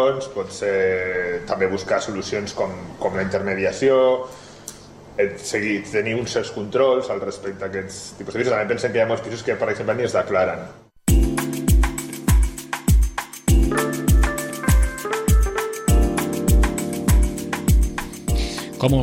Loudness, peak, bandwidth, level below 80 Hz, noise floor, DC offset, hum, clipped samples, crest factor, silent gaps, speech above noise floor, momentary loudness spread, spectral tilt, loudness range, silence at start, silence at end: -21 LUFS; -4 dBFS; 16.5 kHz; -24 dBFS; -40 dBFS; under 0.1%; none; under 0.1%; 16 dB; none; 18 dB; 9 LU; -5.5 dB/octave; 3 LU; 0 s; 0 s